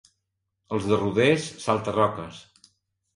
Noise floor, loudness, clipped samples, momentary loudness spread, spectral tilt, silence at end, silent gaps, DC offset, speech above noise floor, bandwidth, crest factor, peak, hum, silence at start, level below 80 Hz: -80 dBFS; -24 LUFS; under 0.1%; 12 LU; -5.5 dB/octave; 0.75 s; none; under 0.1%; 56 dB; 11.5 kHz; 20 dB; -6 dBFS; none; 0.7 s; -56 dBFS